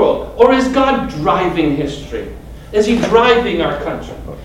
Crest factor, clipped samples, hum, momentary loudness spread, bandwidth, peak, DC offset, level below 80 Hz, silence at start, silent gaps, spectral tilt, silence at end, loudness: 14 dB; 0.2%; none; 15 LU; 13 kHz; 0 dBFS; under 0.1%; -34 dBFS; 0 s; none; -5.5 dB/octave; 0 s; -14 LUFS